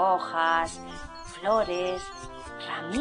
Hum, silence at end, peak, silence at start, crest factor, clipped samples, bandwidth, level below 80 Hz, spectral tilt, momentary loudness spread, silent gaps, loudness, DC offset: none; 0 s; -12 dBFS; 0 s; 18 dB; under 0.1%; 10 kHz; -50 dBFS; -3.5 dB/octave; 16 LU; none; -28 LUFS; under 0.1%